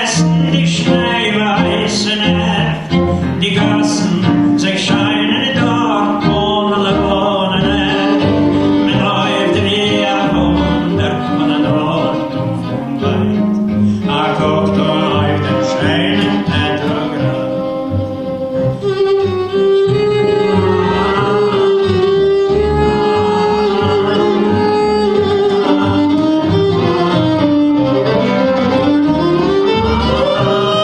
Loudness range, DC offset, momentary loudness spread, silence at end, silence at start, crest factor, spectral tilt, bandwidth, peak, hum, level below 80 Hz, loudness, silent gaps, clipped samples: 3 LU; under 0.1%; 4 LU; 0 s; 0 s; 12 dB; -6 dB/octave; 11 kHz; 0 dBFS; none; -36 dBFS; -13 LUFS; none; under 0.1%